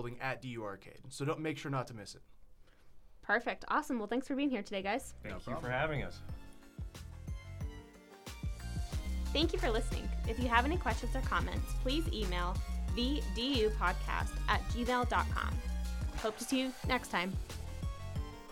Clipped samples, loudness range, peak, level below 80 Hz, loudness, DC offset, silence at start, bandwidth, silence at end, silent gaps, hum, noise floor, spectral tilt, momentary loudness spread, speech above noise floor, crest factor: under 0.1%; 8 LU; -14 dBFS; -42 dBFS; -36 LUFS; under 0.1%; 0 s; 16.5 kHz; 0 s; none; none; -56 dBFS; -5 dB/octave; 16 LU; 21 dB; 24 dB